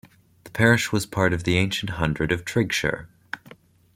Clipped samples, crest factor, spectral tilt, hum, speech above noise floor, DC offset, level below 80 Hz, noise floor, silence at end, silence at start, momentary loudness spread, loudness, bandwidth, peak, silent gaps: under 0.1%; 22 dB; -5 dB/octave; none; 28 dB; under 0.1%; -46 dBFS; -50 dBFS; 0.45 s; 0.45 s; 18 LU; -23 LUFS; 16.5 kHz; -4 dBFS; none